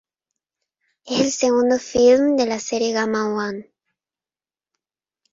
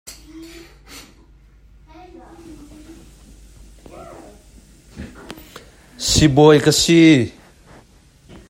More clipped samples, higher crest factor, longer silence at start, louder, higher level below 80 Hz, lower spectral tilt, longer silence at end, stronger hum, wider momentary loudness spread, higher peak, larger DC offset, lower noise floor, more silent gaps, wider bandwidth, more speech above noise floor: neither; about the same, 18 dB vs 20 dB; first, 1.05 s vs 0.1 s; second, -19 LUFS vs -13 LUFS; second, -58 dBFS vs -40 dBFS; about the same, -3.5 dB/octave vs -4.5 dB/octave; first, 1.7 s vs 1.2 s; neither; second, 11 LU vs 29 LU; second, -4 dBFS vs 0 dBFS; neither; first, under -90 dBFS vs -50 dBFS; neither; second, 7.8 kHz vs 16 kHz; first, over 72 dB vs 38 dB